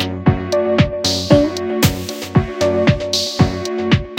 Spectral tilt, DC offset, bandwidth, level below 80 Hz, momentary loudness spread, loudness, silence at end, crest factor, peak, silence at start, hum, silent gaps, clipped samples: -5.5 dB/octave; under 0.1%; 17 kHz; -34 dBFS; 5 LU; -16 LUFS; 0 s; 16 dB; 0 dBFS; 0 s; none; none; under 0.1%